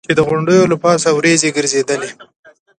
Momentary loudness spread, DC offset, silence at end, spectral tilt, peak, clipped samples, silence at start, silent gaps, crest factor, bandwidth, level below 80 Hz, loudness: 8 LU; under 0.1%; 0.55 s; -4 dB/octave; 0 dBFS; under 0.1%; 0.1 s; none; 14 dB; 10.5 kHz; -52 dBFS; -13 LUFS